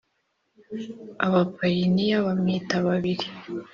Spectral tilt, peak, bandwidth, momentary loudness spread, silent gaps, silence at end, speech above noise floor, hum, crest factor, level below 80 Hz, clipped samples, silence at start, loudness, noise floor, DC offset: -5.5 dB/octave; -6 dBFS; 7 kHz; 14 LU; none; 0.1 s; 49 dB; none; 18 dB; -62 dBFS; under 0.1%; 0.7 s; -24 LUFS; -73 dBFS; under 0.1%